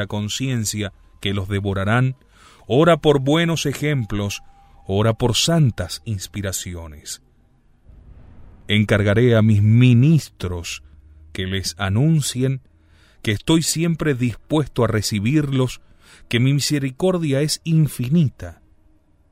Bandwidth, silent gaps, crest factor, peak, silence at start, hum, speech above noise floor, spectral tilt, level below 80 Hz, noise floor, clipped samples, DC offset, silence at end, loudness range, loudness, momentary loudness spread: 16 kHz; none; 18 dB; -2 dBFS; 0 s; none; 36 dB; -5.5 dB/octave; -44 dBFS; -55 dBFS; under 0.1%; under 0.1%; 0.8 s; 5 LU; -19 LUFS; 14 LU